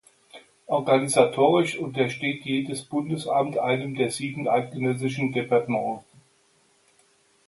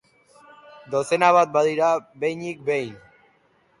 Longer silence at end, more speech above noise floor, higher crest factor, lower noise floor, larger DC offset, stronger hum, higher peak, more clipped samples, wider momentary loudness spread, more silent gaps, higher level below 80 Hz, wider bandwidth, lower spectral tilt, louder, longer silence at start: first, 1.45 s vs 0.85 s; about the same, 39 dB vs 41 dB; about the same, 22 dB vs 18 dB; about the same, -63 dBFS vs -62 dBFS; neither; neither; about the same, -4 dBFS vs -6 dBFS; neither; second, 8 LU vs 11 LU; neither; about the same, -68 dBFS vs -70 dBFS; about the same, 11.5 kHz vs 11.5 kHz; about the same, -5 dB/octave vs -5 dB/octave; second, -24 LUFS vs -21 LUFS; second, 0.35 s vs 0.9 s